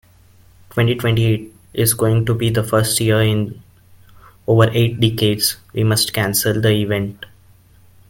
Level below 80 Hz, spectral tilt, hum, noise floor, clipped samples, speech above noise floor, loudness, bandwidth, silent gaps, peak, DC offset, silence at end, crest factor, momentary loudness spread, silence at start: -46 dBFS; -5 dB/octave; none; -49 dBFS; under 0.1%; 32 dB; -17 LUFS; 17 kHz; none; 0 dBFS; under 0.1%; 0.85 s; 18 dB; 8 LU; 0.75 s